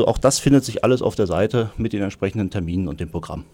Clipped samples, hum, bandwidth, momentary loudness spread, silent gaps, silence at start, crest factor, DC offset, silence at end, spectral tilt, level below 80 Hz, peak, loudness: under 0.1%; none; 17 kHz; 10 LU; none; 0 s; 16 dB; under 0.1%; 0.1 s; -5.5 dB/octave; -38 dBFS; -4 dBFS; -21 LUFS